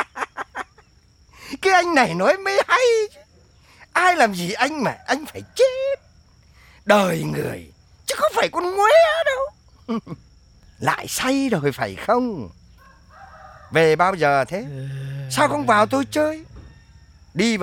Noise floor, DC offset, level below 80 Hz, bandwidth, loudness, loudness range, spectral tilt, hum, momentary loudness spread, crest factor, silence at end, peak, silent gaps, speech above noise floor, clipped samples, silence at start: -54 dBFS; under 0.1%; -52 dBFS; 17.5 kHz; -20 LUFS; 4 LU; -4.5 dB/octave; none; 16 LU; 20 dB; 0 s; 0 dBFS; none; 35 dB; under 0.1%; 0 s